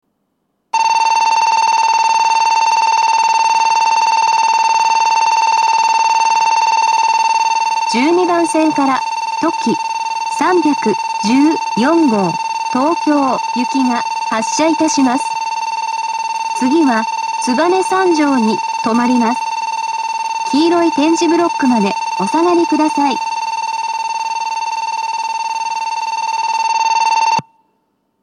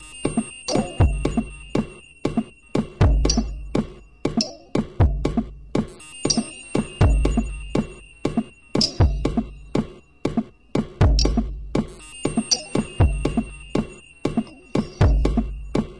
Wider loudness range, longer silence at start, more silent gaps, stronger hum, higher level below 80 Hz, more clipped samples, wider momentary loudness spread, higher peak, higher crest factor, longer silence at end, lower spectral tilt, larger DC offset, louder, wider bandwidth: about the same, 4 LU vs 2 LU; first, 0.75 s vs 0 s; neither; neither; second, -72 dBFS vs -28 dBFS; neither; about the same, 7 LU vs 9 LU; first, 0 dBFS vs -4 dBFS; about the same, 14 dB vs 18 dB; first, 0.8 s vs 0 s; second, -3 dB/octave vs -5.5 dB/octave; second, under 0.1% vs 0.2%; first, -14 LUFS vs -24 LUFS; about the same, 11.5 kHz vs 11 kHz